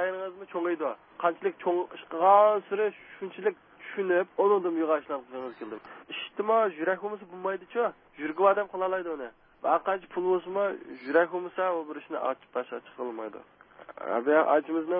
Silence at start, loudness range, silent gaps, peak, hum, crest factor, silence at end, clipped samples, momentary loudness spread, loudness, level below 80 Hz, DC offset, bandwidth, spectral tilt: 0 s; 5 LU; none; -8 dBFS; none; 20 dB; 0 s; under 0.1%; 15 LU; -28 LUFS; -78 dBFS; under 0.1%; 4.8 kHz; -9 dB/octave